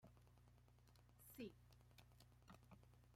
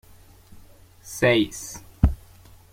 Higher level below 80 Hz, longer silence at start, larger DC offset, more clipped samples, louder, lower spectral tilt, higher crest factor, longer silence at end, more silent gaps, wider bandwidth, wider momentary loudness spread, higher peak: second, -76 dBFS vs -34 dBFS; second, 0 s vs 1.05 s; neither; neither; second, -63 LUFS vs -23 LUFS; about the same, -5.5 dB/octave vs -5 dB/octave; about the same, 22 dB vs 24 dB; second, 0 s vs 0.6 s; neither; about the same, 16 kHz vs 16.5 kHz; second, 11 LU vs 18 LU; second, -44 dBFS vs -2 dBFS